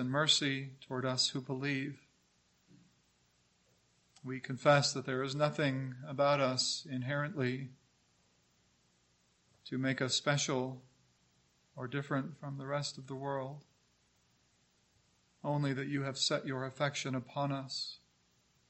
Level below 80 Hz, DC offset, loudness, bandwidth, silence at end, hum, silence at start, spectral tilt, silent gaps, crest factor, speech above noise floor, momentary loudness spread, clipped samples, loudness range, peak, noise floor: -78 dBFS; under 0.1%; -35 LUFS; 8.6 kHz; 0.75 s; 60 Hz at -70 dBFS; 0 s; -4 dB/octave; none; 24 dB; 38 dB; 14 LU; under 0.1%; 9 LU; -12 dBFS; -73 dBFS